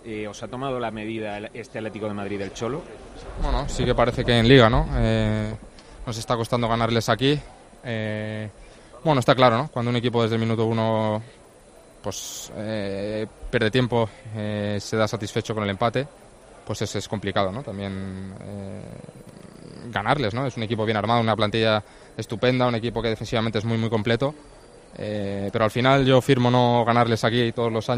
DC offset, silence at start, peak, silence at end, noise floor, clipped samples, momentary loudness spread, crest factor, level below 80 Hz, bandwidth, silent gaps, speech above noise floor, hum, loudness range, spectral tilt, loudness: under 0.1%; 0.05 s; 0 dBFS; 0 s; -49 dBFS; under 0.1%; 16 LU; 22 dB; -40 dBFS; 13 kHz; none; 26 dB; none; 8 LU; -6 dB/octave; -23 LUFS